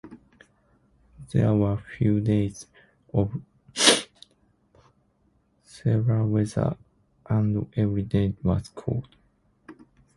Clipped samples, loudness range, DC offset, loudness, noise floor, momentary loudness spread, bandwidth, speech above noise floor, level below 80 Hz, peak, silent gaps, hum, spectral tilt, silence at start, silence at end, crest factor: under 0.1%; 4 LU; under 0.1%; -25 LUFS; -66 dBFS; 12 LU; 11.5 kHz; 42 dB; -48 dBFS; 0 dBFS; none; none; -5 dB/octave; 0.05 s; 0.45 s; 26 dB